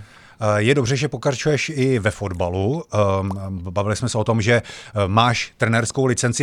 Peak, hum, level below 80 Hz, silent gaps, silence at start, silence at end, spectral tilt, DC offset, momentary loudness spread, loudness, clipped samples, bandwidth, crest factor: -2 dBFS; none; -48 dBFS; none; 0 s; 0 s; -5 dB/octave; under 0.1%; 7 LU; -20 LUFS; under 0.1%; 11.5 kHz; 18 dB